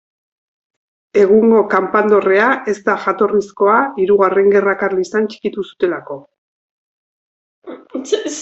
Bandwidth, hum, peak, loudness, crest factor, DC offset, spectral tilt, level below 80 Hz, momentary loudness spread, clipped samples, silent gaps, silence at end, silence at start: 8.2 kHz; none; -2 dBFS; -14 LUFS; 14 dB; under 0.1%; -5.5 dB/octave; -60 dBFS; 12 LU; under 0.1%; 6.38-7.62 s; 0 s; 1.15 s